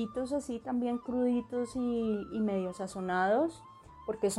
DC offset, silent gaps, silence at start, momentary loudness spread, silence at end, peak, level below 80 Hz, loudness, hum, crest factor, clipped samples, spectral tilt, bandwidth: under 0.1%; none; 0 s; 9 LU; 0 s; -18 dBFS; -62 dBFS; -33 LUFS; none; 14 dB; under 0.1%; -5.5 dB/octave; 12.5 kHz